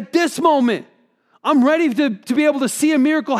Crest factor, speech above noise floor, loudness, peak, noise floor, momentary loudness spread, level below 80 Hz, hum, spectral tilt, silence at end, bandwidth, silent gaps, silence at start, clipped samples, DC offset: 14 dB; 42 dB; -17 LUFS; -2 dBFS; -58 dBFS; 5 LU; -72 dBFS; none; -4 dB/octave; 0 s; 15 kHz; none; 0 s; under 0.1%; under 0.1%